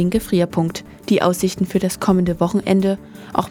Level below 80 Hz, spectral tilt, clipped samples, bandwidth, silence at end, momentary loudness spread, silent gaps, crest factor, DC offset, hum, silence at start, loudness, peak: -42 dBFS; -6 dB/octave; under 0.1%; 18 kHz; 0 s; 7 LU; none; 18 dB; under 0.1%; none; 0 s; -19 LUFS; -2 dBFS